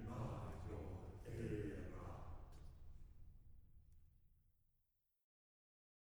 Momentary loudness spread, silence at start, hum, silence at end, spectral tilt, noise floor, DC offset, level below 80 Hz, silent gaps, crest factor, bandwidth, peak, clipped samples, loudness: 19 LU; 0 s; none; 1.55 s; -8 dB/octave; -86 dBFS; under 0.1%; -60 dBFS; none; 18 dB; over 20 kHz; -34 dBFS; under 0.1%; -52 LUFS